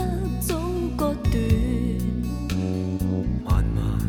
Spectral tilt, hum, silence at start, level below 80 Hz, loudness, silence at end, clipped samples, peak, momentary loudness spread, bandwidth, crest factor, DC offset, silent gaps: -7 dB/octave; none; 0 s; -28 dBFS; -25 LUFS; 0 s; under 0.1%; -8 dBFS; 4 LU; 17.5 kHz; 14 dB; under 0.1%; none